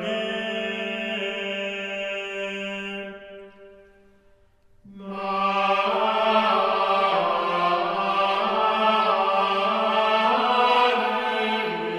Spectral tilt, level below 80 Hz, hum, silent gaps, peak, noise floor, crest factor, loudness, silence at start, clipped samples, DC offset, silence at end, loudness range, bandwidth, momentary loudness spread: -4.5 dB/octave; -64 dBFS; none; none; -8 dBFS; -57 dBFS; 16 dB; -23 LUFS; 0 s; under 0.1%; under 0.1%; 0 s; 11 LU; 13.5 kHz; 10 LU